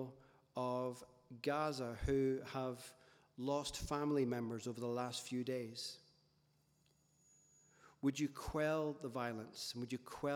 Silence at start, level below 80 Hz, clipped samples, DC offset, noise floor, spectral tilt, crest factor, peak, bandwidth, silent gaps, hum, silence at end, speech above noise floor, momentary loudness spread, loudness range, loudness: 0 s; -60 dBFS; under 0.1%; under 0.1%; -76 dBFS; -5 dB/octave; 18 dB; -26 dBFS; 18.5 kHz; none; none; 0 s; 35 dB; 11 LU; 6 LU; -42 LUFS